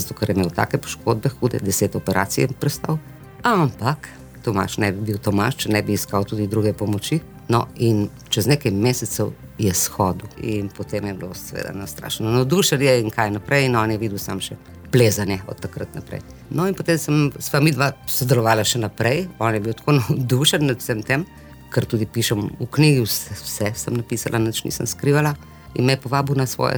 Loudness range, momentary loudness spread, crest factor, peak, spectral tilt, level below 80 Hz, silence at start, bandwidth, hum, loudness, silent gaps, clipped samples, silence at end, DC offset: 3 LU; 11 LU; 18 dB; -4 dBFS; -5 dB/octave; -48 dBFS; 0 s; over 20 kHz; none; -21 LUFS; none; under 0.1%; 0 s; under 0.1%